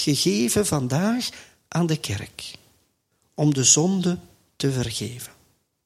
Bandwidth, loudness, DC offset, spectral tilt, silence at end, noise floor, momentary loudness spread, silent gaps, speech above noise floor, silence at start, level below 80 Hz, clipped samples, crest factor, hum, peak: 16 kHz; -22 LUFS; under 0.1%; -4 dB/octave; 0.55 s; -69 dBFS; 20 LU; none; 46 dB; 0 s; -54 dBFS; under 0.1%; 22 dB; none; -2 dBFS